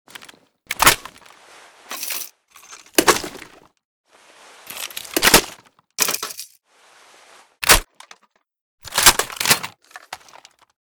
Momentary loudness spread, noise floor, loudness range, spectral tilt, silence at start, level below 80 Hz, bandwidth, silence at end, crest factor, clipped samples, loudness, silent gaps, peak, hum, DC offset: 24 LU; -59 dBFS; 6 LU; -0.5 dB/octave; 0.7 s; -40 dBFS; over 20 kHz; 0.75 s; 22 dB; under 0.1%; -17 LUFS; 3.85-4.04 s, 8.61-8.78 s; 0 dBFS; none; under 0.1%